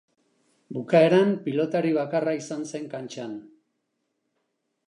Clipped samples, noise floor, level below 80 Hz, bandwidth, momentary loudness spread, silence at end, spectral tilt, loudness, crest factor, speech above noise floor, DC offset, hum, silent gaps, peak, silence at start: under 0.1%; -77 dBFS; -80 dBFS; 11 kHz; 17 LU; 1.45 s; -6.5 dB/octave; -24 LUFS; 20 dB; 53 dB; under 0.1%; none; none; -6 dBFS; 0.7 s